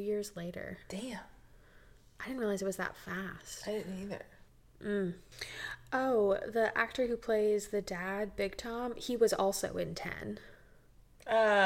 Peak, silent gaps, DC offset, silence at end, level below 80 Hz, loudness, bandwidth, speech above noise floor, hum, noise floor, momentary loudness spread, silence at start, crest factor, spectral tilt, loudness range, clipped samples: -14 dBFS; none; under 0.1%; 0 s; -60 dBFS; -35 LUFS; 16.5 kHz; 26 dB; none; -60 dBFS; 14 LU; 0 s; 20 dB; -4.5 dB/octave; 7 LU; under 0.1%